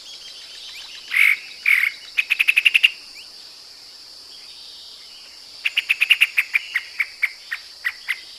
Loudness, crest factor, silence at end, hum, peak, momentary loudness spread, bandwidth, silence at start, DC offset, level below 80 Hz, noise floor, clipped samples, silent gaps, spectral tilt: -18 LUFS; 22 dB; 0 s; none; 0 dBFS; 24 LU; 14.5 kHz; 0 s; under 0.1%; -70 dBFS; -42 dBFS; under 0.1%; none; 3.5 dB/octave